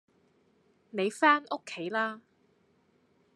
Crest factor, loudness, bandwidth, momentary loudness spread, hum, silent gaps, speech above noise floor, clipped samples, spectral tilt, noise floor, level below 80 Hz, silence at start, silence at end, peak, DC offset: 24 dB; -29 LUFS; 12.5 kHz; 15 LU; none; none; 39 dB; under 0.1%; -4 dB/octave; -69 dBFS; -90 dBFS; 0.95 s; 1.15 s; -10 dBFS; under 0.1%